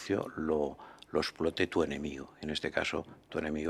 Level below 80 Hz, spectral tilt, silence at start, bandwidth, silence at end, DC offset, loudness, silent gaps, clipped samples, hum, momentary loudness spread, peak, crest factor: -58 dBFS; -5 dB/octave; 0 s; 14 kHz; 0 s; under 0.1%; -35 LUFS; none; under 0.1%; none; 9 LU; -12 dBFS; 22 dB